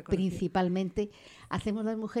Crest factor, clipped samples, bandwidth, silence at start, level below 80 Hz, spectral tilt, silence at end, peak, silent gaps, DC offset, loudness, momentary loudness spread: 16 dB; under 0.1%; 11 kHz; 0 s; -52 dBFS; -7 dB/octave; 0 s; -16 dBFS; none; under 0.1%; -32 LUFS; 9 LU